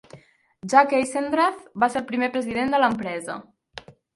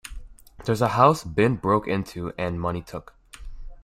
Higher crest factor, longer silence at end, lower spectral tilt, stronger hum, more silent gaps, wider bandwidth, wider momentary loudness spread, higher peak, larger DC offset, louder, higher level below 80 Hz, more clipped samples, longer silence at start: about the same, 22 dB vs 22 dB; first, 0.25 s vs 0.1 s; second, -4.5 dB/octave vs -6.5 dB/octave; neither; neither; second, 11.5 kHz vs 16 kHz; first, 23 LU vs 20 LU; about the same, -2 dBFS vs -2 dBFS; neither; about the same, -22 LUFS vs -23 LUFS; second, -62 dBFS vs -44 dBFS; neither; about the same, 0.15 s vs 0.05 s